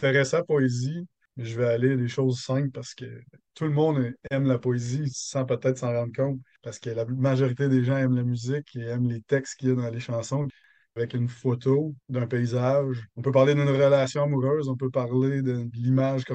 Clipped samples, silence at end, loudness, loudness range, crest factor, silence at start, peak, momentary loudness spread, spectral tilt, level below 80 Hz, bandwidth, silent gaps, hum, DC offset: under 0.1%; 0 s; -26 LUFS; 4 LU; 18 dB; 0 s; -8 dBFS; 10 LU; -7 dB/octave; -66 dBFS; 8.6 kHz; none; none; under 0.1%